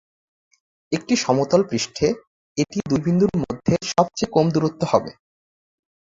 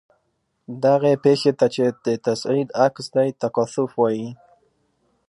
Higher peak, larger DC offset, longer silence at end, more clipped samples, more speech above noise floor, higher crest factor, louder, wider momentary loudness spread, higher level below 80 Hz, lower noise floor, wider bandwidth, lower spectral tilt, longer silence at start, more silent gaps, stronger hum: about the same, -2 dBFS vs -4 dBFS; neither; about the same, 1 s vs 0.95 s; neither; first, over 70 dB vs 51 dB; about the same, 20 dB vs 18 dB; about the same, -21 LUFS vs -20 LUFS; about the same, 9 LU vs 7 LU; first, -52 dBFS vs -68 dBFS; first, under -90 dBFS vs -71 dBFS; second, 7.8 kHz vs 11.5 kHz; about the same, -5.5 dB/octave vs -6 dB/octave; first, 0.9 s vs 0.7 s; first, 2.27-2.55 s vs none; neither